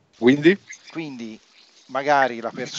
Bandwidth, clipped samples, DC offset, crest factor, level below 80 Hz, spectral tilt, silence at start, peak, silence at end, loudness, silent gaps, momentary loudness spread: 7.8 kHz; under 0.1%; under 0.1%; 20 dB; -72 dBFS; -5.5 dB/octave; 0.2 s; -2 dBFS; 0 s; -20 LUFS; none; 19 LU